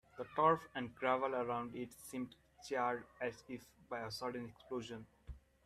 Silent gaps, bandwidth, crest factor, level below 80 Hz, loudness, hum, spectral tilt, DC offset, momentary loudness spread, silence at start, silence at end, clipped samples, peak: none; 15 kHz; 22 dB; -66 dBFS; -40 LUFS; none; -5 dB/octave; under 0.1%; 18 LU; 0.15 s; 0.3 s; under 0.1%; -18 dBFS